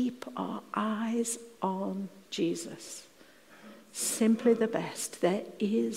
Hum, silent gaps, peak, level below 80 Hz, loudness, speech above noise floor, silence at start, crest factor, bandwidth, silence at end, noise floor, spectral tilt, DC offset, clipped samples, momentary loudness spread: none; none; -14 dBFS; -82 dBFS; -31 LUFS; 26 dB; 0 s; 18 dB; 16 kHz; 0 s; -57 dBFS; -4.5 dB/octave; under 0.1%; under 0.1%; 16 LU